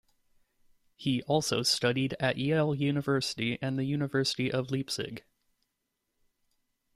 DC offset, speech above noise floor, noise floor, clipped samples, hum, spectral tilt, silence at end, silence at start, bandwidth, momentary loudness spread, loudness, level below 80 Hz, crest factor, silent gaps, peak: under 0.1%; 53 dB; -82 dBFS; under 0.1%; none; -5 dB/octave; 1.75 s; 1 s; 15.5 kHz; 7 LU; -30 LUFS; -66 dBFS; 18 dB; none; -14 dBFS